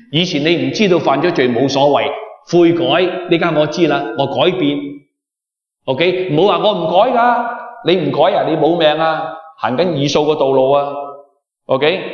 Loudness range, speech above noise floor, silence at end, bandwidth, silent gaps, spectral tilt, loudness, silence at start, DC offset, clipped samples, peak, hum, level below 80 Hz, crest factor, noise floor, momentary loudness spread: 3 LU; 71 dB; 0 s; 7 kHz; none; -6 dB/octave; -14 LUFS; 0.1 s; under 0.1%; under 0.1%; 0 dBFS; none; -60 dBFS; 14 dB; -84 dBFS; 10 LU